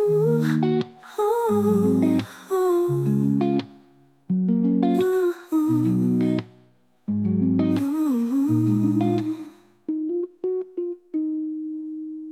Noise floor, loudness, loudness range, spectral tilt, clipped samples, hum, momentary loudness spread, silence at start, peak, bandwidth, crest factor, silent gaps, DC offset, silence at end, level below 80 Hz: -59 dBFS; -23 LUFS; 3 LU; -8.5 dB/octave; under 0.1%; none; 11 LU; 0 s; -8 dBFS; 16 kHz; 14 dB; none; under 0.1%; 0 s; -66 dBFS